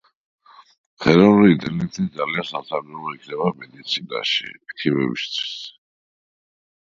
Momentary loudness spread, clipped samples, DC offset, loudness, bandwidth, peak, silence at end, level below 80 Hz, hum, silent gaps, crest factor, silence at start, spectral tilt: 18 LU; under 0.1%; under 0.1%; -20 LUFS; 7.4 kHz; 0 dBFS; 1.25 s; -56 dBFS; none; none; 22 dB; 1 s; -6 dB/octave